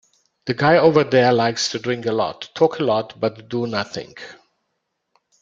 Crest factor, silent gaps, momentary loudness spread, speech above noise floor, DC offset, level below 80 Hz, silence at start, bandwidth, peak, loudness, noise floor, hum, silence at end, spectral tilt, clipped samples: 20 dB; none; 17 LU; 56 dB; under 0.1%; -60 dBFS; 0.45 s; 7.6 kHz; 0 dBFS; -19 LUFS; -75 dBFS; none; 1.1 s; -5 dB/octave; under 0.1%